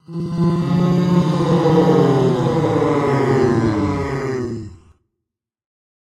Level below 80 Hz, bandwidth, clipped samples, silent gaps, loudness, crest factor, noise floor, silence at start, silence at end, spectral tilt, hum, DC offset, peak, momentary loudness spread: -44 dBFS; 10 kHz; under 0.1%; none; -17 LUFS; 16 dB; -82 dBFS; 0.1 s; 1.35 s; -8 dB/octave; none; under 0.1%; -2 dBFS; 9 LU